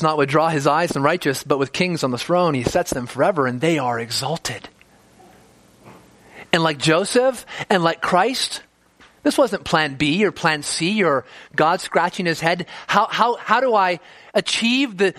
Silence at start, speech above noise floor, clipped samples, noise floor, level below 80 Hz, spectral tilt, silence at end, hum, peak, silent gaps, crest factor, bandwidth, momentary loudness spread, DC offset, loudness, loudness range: 0 s; 33 dB; under 0.1%; -53 dBFS; -54 dBFS; -4 dB/octave; 0 s; none; 0 dBFS; none; 20 dB; 15.5 kHz; 7 LU; under 0.1%; -19 LUFS; 4 LU